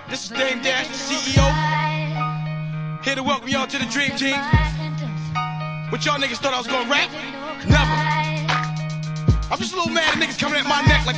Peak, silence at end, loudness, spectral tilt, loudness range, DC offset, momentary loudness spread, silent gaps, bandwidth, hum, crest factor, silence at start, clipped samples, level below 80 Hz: -2 dBFS; 0 s; -21 LUFS; -4.5 dB/octave; 2 LU; 0.2%; 9 LU; none; 9.6 kHz; none; 18 dB; 0 s; under 0.1%; -32 dBFS